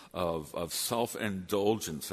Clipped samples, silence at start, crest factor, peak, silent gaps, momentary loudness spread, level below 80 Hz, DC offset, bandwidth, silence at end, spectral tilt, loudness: under 0.1%; 0 s; 18 dB; -14 dBFS; none; 5 LU; -60 dBFS; under 0.1%; 13.5 kHz; 0 s; -4 dB/octave; -33 LUFS